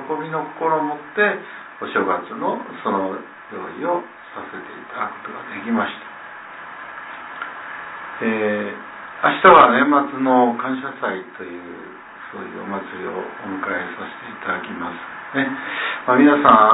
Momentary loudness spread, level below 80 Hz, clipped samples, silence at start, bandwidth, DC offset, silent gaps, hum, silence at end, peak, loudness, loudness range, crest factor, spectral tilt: 21 LU; -60 dBFS; under 0.1%; 0 s; 4 kHz; under 0.1%; none; none; 0 s; 0 dBFS; -19 LUFS; 12 LU; 20 dB; -9 dB/octave